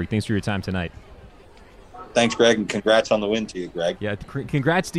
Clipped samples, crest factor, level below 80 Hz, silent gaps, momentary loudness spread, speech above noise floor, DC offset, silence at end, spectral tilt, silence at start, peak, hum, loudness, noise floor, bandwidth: under 0.1%; 20 dB; -48 dBFS; none; 11 LU; 25 dB; under 0.1%; 0 s; -5 dB/octave; 0 s; -2 dBFS; none; -22 LUFS; -47 dBFS; 13 kHz